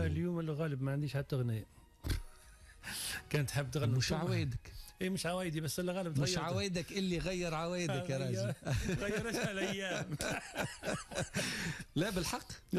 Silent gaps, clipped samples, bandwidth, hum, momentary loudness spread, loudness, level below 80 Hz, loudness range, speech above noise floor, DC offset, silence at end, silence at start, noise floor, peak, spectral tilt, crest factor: none; under 0.1%; 14 kHz; none; 7 LU; -37 LUFS; -52 dBFS; 2 LU; 21 dB; under 0.1%; 0 s; 0 s; -58 dBFS; -24 dBFS; -5 dB/octave; 12 dB